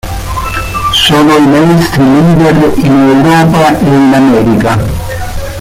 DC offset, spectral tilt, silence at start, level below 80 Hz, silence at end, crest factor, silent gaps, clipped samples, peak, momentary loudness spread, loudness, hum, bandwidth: under 0.1%; -6 dB/octave; 0.05 s; -24 dBFS; 0 s; 6 dB; none; under 0.1%; 0 dBFS; 11 LU; -7 LUFS; none; 16.5 kHz